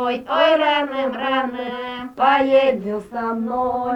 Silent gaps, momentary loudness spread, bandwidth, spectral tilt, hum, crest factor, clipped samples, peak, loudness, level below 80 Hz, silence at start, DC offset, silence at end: none; 12 LU; 7.8 kHz; -5.5 dB/octave; none; 16 dB; under 0.1%; -4 dBFS; -19 LUFS; -56 dBFS; 0 s; under 0.1%; 0 s